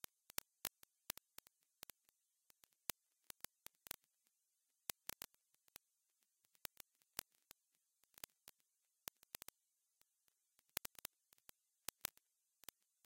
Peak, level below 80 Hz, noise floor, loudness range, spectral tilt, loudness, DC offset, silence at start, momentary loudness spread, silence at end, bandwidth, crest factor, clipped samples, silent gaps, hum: -12 dBFS; -82 dBFS; -87 dBFS; 4 LU; 0 dB/octave; -53 LUFS; under 0.1%; 0.65 s; 17 LU; 4.55 s; 17 kHz; 46 dB; under 0.1%; none; none